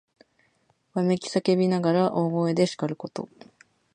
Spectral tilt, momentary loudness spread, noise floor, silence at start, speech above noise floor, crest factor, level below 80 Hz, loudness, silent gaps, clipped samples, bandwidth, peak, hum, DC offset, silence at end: -6.5 dB/octave; 13 LU; -68 dBFS; 0.95 s; 44 dB; 18 dB; -70 dBFS; -25 LUFS; none; under 0.1%; 9.6 kHz; -8 dBFS; none; under 0.1%; 0.7 s